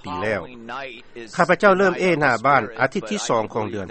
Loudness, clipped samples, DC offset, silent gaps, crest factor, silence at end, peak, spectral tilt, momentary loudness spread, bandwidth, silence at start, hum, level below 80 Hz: -20 LUFS; under 0.1%; under 0.1%; none; 20 dB; 0 s; 0 dBFS; -5 dB/octave; 16 LU; 8.8 kHz; 0.05 s; none; -54 dBFS